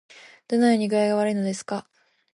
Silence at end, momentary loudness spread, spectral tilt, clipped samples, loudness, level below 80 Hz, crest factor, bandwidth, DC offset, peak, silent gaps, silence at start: 0.55 s; 12 LU; -5.5 dB/octave; under 0.1%; -23 LUFS; -74 dBFS; 16 dB; 11.5 kHz; under 0.1%; -8 dBFS; none; 0.5 s